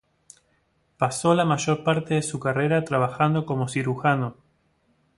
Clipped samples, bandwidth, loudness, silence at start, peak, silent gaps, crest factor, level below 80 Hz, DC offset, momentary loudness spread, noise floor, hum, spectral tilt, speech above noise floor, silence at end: under 0.1%; 11.5 kHz; -24 LUFS; 1 s; -6 dBFS; none; 20 dB; -60 dBFS; under 0.1%; 5 LU; -67 dBFS; none; -5.5 dB/octave; 44 dB; 0.85 s